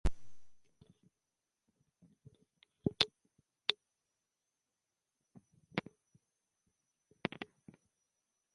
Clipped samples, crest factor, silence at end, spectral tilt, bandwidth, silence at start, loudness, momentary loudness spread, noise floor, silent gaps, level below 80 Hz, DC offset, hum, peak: under 0.1%; 36 dB; 1.1 s; -4.5 dB/octave; 11 kHz; 0.05 s; -40 LUFS; 17 LU; -89 dBFS; none; -52 dBFS; under 0.1%; none; -8 dBFS